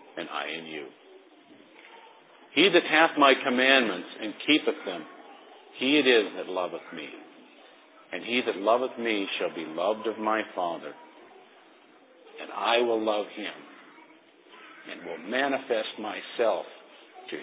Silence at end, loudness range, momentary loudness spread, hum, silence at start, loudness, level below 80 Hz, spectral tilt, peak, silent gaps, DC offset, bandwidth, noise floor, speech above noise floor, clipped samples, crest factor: 0 s; 9 LU; 20 LU; none; 0.15 s; -26 LUFS; under -90 dBFS; -7 dB/octave; -6 dBFS; none; under 0.1%; 4 kHz; -56 dBFS; 29 dB; under 0.1%; 24 dB